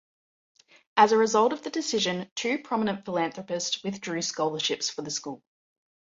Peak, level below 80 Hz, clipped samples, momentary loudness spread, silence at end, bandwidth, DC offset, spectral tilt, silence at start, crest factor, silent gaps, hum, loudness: -6 dBFS; -72 dBFS; under 0.1%; 11 LU; 0.65 s; 7.8 kHz; under 0.1%; -3 dB/octave; 0.95 s; 22 dB; 2.31-2.36 s; none; -27 LUFS